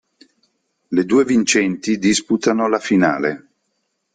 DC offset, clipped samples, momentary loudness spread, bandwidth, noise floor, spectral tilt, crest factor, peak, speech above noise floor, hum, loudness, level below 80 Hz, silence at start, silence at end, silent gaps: under 0.1%; under 0.1%; 7 LU; 9.6 kHz; -71 dBFS; -4 dB/octave; 16 dB; -2 dBFS; 55 dB; none; -17 LUFS; -58 dBFS; 0.9 s; 0.75 s; none